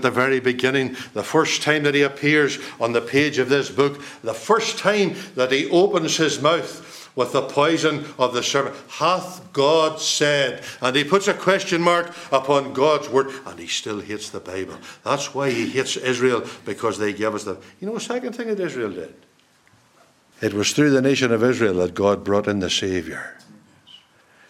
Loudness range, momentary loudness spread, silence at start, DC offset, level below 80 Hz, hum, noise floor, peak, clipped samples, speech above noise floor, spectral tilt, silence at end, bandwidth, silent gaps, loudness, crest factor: 5 LU; 12 LU; 0 s; under 0.1%; -64 dBFS; none; -57 dBFS; -2 dBFS; under 0.1%; 36 dB; -4 dB/octave; 0.55 s; 15 kHz; none; -21 LUFS; 20 dB